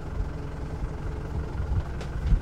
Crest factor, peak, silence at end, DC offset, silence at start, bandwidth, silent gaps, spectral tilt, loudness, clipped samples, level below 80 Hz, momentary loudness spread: 18 dB; -10 dBFS; 0 s; under 0.1%; 0 s; 9.4 kHz; none; -8 dB/octave; -33 LUFS; under 0.1%; -30 dBFS; 5 LU